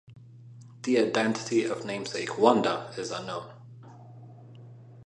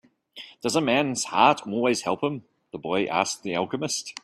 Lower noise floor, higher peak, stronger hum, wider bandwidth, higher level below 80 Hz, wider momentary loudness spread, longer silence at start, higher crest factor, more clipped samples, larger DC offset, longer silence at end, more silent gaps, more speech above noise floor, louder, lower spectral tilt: about the same, -49 dBFS vs -47 dBFS; second, -6 dBFS vs -2 dBFS; neither; second, 11 kHz vs 14.5 kHz; second, -72 dBFS vs -66 dBFS; first, 26 LU vs 17 LU; second, 0.1 s vs 0.35 s; about the same, 24 dB vs 22 dB; neither; neither; about the same, 0 s vs 0.1 s; neither; about the same, 22 dB vs 22 dB; second, -28 LUFS vs -24 LUFS; about the same, -4.5 dB/octave vs -3.5 dB/octave